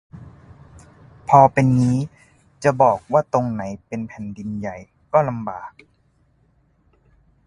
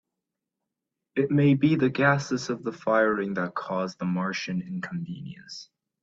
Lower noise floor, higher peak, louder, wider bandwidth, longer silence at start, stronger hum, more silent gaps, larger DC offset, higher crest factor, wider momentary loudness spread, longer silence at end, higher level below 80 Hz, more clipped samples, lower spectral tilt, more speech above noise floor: second, -61 dBFS vs -85 dBFS; first, 0 dBFS vs -8 dBFS; first, -19 LUFS vs -26 LUFS; first, 11 kHz vs 7.8 kHz; second, 0.15 s vs 1.15 s; neither; neither; neither; about the same, 22 dB vs 20 dB; about the same, 18 LU vs 16 LU; first, 1.8 s vs 0.4 s; first, -52 dBFS vs -66 dBFS; neither; first, -8 dB/octave vs -6.5 dB/octave; second, 42 dB vs 60 dB